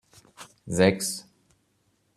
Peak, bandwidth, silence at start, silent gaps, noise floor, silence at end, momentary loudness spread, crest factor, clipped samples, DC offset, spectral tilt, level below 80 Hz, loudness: -4 dBFS; 13.5 kHz; 0.4 s; none; -70 dBFS; 0.95 s; 25 LU; 24 dB; under 0.1%; under 0.1%; -4.5 dB/octave; -62 dBFS; -25 LUFS